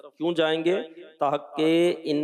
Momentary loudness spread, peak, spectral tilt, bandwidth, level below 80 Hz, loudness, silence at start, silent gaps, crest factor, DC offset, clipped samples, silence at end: 7 LU; -12 dBFS; -6 dB/octave; 12 kHz; -82 dBFS; -25 LUFS; 0.05 s; none; 12 dB; under 0.1%; under 0.1%; 0 s